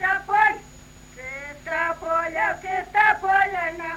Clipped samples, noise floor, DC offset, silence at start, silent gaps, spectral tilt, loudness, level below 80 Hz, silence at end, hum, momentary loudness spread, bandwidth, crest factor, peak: under 0.1%; -46 dBFS; under 0.1%; 0 s; none; -3.5 dB/octave; -21 LUFS; -52 dBFS; 0 s; none; 15 LU; 16.5 kHz; 20 dB; -4 dBFS